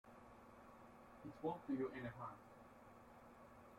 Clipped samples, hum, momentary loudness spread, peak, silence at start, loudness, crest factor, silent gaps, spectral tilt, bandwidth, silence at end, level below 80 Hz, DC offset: under 0.1%; none; 18 LU; -34 dBFS; 0.05 s; -49 LUFS; 20 dB; none; -7.5 dB/octave; 16.5 kHz; 0 s; -76 dBFS; under 0.1%